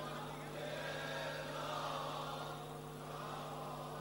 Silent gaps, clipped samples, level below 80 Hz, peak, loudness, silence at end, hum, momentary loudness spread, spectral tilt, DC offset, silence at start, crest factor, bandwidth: none; under 0.1%; -66 dBFS; -30 dBFS; -44 LUFS; 0 s; none; 5 LU; -4.5 dB/octave; under 0.1%; 0 s; 14 dB; 16 kHz